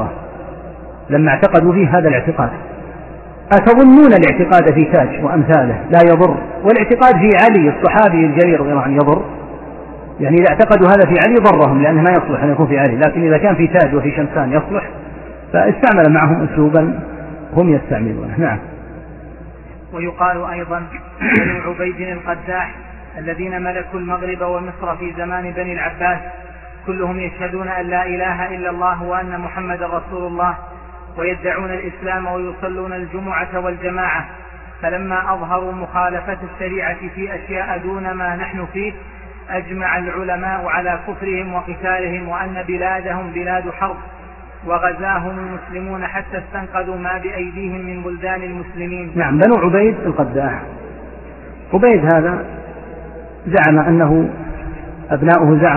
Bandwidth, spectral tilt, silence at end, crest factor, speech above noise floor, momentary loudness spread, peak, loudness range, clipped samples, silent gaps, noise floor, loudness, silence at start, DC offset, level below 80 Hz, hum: 4.6 kHz; -10 dB/octave; 0 s; 14 dB; 20 dB; 21 LU; 0 dBFS; 12 LU; under 0.1%; none; -34 dBFS; -15 LUFS; 0 s; under 0.1%; -36 dBFS; none